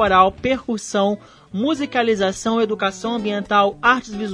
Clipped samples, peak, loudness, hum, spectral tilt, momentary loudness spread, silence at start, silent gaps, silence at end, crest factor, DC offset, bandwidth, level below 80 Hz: under 0.1%; 0 dBFS; -19 LUFS; none; -4.5 dB/octave; 8 LU; 0 s; none; 0 s; 18 dB; under 0.1%; 10.5 kHz; -48 dBFS